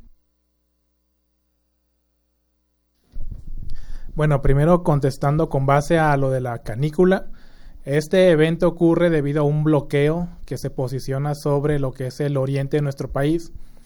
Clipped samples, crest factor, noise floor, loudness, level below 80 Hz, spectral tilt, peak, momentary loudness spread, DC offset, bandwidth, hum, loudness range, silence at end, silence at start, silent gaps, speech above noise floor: under 0.1%; 18 dB; -69 dBFS; -20 LUFS; -34 dBFS; -7.5 dB/octave; -2 dBFS; 17 LU; under 0.1%; 17.5 kHz; 60 Hz at -50 dBFS; 5 LU; 0.15 s; 3.15 s; none; 50 dB